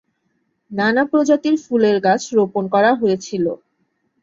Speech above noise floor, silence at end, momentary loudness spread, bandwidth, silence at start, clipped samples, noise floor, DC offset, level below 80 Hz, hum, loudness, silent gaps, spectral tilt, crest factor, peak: 52 dB; 0.7 s; 7 LU; 7.8 kHz; 0.7 s; under 0.1%; -68 dBFS; under 0.1%; -64 dBFS; none; -17 LUFS; none; -5.5 dB/octave; 14 dB; -2 dBFS